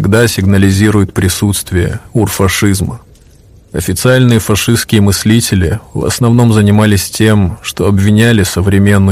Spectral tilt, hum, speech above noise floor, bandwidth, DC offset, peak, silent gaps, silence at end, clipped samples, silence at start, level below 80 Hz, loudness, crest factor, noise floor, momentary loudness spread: -5.5 dB/octave; none; 31 dB; 16 kHz; under 0.1%; 0 dBFS; none; 0 s; 0.9%; 0 s; -32 dBFS; -10 LUFS; 10 dB; -40 dBFS; 8 LU